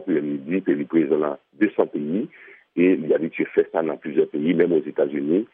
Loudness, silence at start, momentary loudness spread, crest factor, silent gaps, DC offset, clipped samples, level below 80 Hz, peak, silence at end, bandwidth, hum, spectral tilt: -22 LUFS; 0 s; 6 LU; 16 dB; none; under 0.1%; under 0.1%; -72 dBFS; -6 dBFS; 0.1 s; 3.7 kHz; none; -6.5 dB/octave